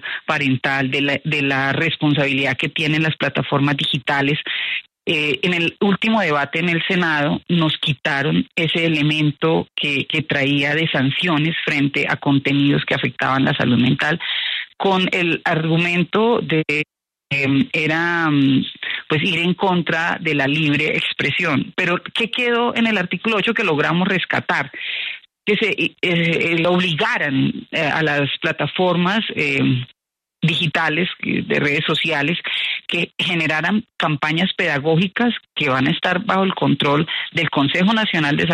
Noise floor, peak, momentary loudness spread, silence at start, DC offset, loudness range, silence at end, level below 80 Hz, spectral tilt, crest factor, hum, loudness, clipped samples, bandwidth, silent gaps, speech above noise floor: -84 dBFS; -4 dBFS; 4 LU; 0 s; under 0.1%; 1 LU; 0 s; -58 dBFS; -6 dB/octave; 14 dB; none; -18 LUFS; under 0.1%; 11.5 kHz; none; 65 dB